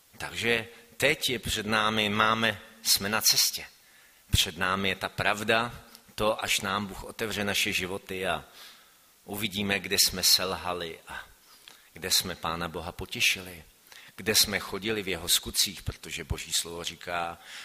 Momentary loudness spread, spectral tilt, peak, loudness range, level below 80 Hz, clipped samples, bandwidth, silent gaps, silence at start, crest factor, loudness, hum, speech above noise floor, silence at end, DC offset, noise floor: 15 LU; -2 dB/octave; -8 dBFS; 5 LU; -50 dBFS; under 0.1%; 15.5 kHz; none; 0.15 s; 22 dB; -27 LUFS; none; 30 dB; 0 s; under 0.1%; -59 dBFS